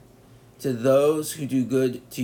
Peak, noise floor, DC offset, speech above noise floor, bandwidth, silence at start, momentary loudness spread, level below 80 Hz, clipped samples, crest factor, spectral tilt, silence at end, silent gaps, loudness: -8 dBFS; -51 dBFS; under 0.1%; 29 dB; 18.5 kHz; 0.6 s; 9 LU; -64 dBFS; under 0.1%; 16 dB; -6 dB/octave; 0 s; none; -23 LUFS